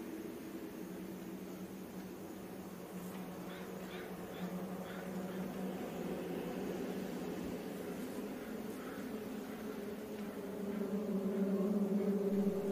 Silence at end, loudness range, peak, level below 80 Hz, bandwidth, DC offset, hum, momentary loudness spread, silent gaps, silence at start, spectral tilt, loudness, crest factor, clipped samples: 0 s; 8 LU; -24 dBFS; -70 dBFS; 15.5 kHz; under 0.1%; none; 12 LU; none; 0 s; -6.5 dB/octave; -42 LUFS; 18 dB; under 0.1%